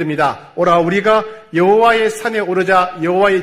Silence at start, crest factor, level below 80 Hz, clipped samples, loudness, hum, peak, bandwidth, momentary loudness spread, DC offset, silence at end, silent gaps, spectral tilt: 0 s; 12 dB; -50 dBFS; under 0.1%; -14 LUFS; none; 0 dBFS; 15 kHz; 7 LU; under 0.1%; 0 s; none; -5.5 dB/octave